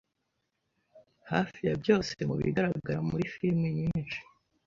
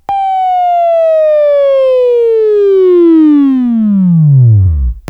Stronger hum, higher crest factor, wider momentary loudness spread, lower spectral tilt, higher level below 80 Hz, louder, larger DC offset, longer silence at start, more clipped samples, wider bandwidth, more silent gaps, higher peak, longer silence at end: neither; first, 22 dB vs 8 dB; about the same, 5 LU vs 5 LU; second, -7 dB/octave vs -11 dB/octave; second, -56 dBFS vs -24 dBFS; second, -31 LUFS vs -8 LUFS; neither; first, 0.95 s vs 0.1 s; neither; first, 7.4 kHz vs 5.6 kHz; neither; second, -10 dBFS vs 0 dBFS; first, 0.45 s vs 0.1 s